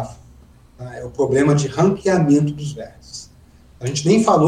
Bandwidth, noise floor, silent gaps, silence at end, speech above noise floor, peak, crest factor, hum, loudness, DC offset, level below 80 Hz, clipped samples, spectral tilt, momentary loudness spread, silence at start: 11 kHz; -47 dBFS; none; 0 s; 30 dB; -2 dBFS; 18 dB; none; -18 LUFS; under 0.1%; -48 dBFS; under 0.1%; -6.5 dB/octave; 20 LU; 0 s